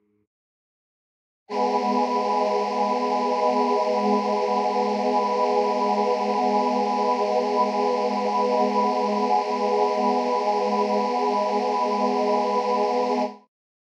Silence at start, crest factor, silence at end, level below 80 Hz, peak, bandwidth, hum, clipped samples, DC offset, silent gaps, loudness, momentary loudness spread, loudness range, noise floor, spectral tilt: 1.5 s; 14 dB; 0.55 s; under -90 dBFS; -8 dBFS; 10 kHz; none; under 0.1%; under 0.1%; none; -23 LUFS; 2 LU; 1 LU; under -90 dBFS; -5.5 dB/octave